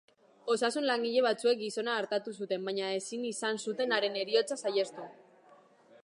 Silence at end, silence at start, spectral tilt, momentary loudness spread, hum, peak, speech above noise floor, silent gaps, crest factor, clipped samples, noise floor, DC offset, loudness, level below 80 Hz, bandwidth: 0.9 s; 0.45 s; -3 dB/octave; 8 LU; none; -14 dBFS; 29 dB; none; 18 dB; under 0.1%; -61 dBFS; under 0.1%; -32 LUFS; -90 dBFS; 11.5 kHz